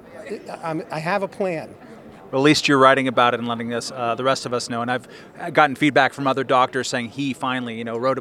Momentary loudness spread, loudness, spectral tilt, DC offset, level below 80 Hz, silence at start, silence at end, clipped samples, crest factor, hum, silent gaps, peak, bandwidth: 13 LU; -20 LUFS; -4.5 dB/octave; under 0.1%; -64 dBFS; 0.05 s; 0 s; under 0.1%; 22 dB; none; none; 0 dBFS; 14 kHz